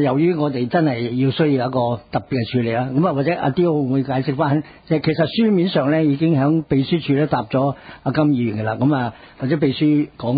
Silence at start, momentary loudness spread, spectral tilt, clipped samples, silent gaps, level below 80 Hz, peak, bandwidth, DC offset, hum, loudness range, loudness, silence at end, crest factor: 0 s; 6 LU; -12.5 dB/octave; under 0.1%; none; -52 dBFS; -6 dBFS; 5 kHz; under 0.1%; none; 2 LU; -19 LUFS; 0 s; 12 dB